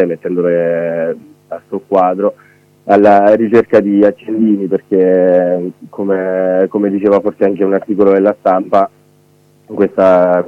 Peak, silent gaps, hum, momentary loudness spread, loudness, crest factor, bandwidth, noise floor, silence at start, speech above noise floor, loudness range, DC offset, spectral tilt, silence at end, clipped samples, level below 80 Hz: 0 dBFS; none; none; 11 LU; -12 LUFS; 12 dB; 6.6 kHz; -49 dBFS; 0 s; 38 dB; 3 LU; under 0.1%; -9 dB/octave; 0 s; under 0.1%; -56 dBFS